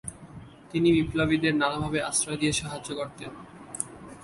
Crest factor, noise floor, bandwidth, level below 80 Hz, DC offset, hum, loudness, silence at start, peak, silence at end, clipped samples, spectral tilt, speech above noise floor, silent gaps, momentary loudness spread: 20 dB; -46 dBFS; 11.5 kHz; -50 dBFS; under 0.1%; none; -27 LUFS; 0.05 s; -8 dBFS; 0 s; under 0.1%; -4 dB/octave; 20 dB; none; 19 LU